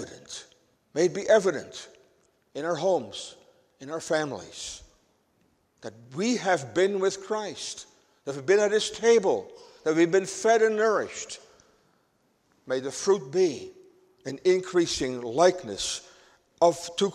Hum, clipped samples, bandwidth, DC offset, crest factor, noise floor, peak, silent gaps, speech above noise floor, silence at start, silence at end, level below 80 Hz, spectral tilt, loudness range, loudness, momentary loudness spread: none; under 0.1%; 12 kHz; under 0.1%; 20 dB; -69 dBFS; -6 dBFS; none; 43 dB; 0 s; 0 s; -64 dBFS; -4 dB/octave; 8 LU; -26 LUFS; 19 LU